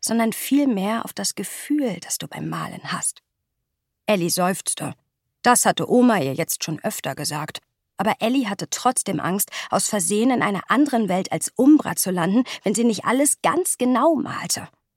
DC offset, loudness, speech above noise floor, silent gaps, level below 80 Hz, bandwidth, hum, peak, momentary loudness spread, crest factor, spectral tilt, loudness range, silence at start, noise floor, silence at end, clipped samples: under 0.1%; -21 LUFS; 57 dB; none; -68 dBFS; 17 kHz; none; -2 dBFS; 10 LU; 20 dB; -4 dB/octave; 6 LU; 0 s; -78 dBFS; 0.3 s; under 0.1%